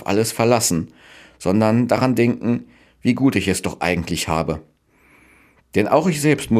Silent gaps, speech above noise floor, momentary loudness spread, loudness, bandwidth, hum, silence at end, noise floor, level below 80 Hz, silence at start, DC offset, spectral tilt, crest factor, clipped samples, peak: none; 37 dB; 9 LU; -19 LUFS; 15.5 kHz; none; 0 s; -55 dBFS; -46 dBFS; 0 s; under 0.1%; -5 dB/octave; 18 dB; under 0.1%; -2 dBFS